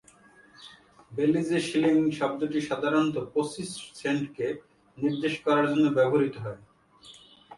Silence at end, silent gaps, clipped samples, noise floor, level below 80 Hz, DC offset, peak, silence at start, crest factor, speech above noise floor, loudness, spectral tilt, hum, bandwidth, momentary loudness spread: 0 s; none; under 0.1%; -56 dBFS; -66 dBFS; under 0.1%; -12 dBFS; 0.6 s; 16 dB; 30 dB; -27 LUFS; -6 dB/octave; none; 11.5 kHz; 13 LU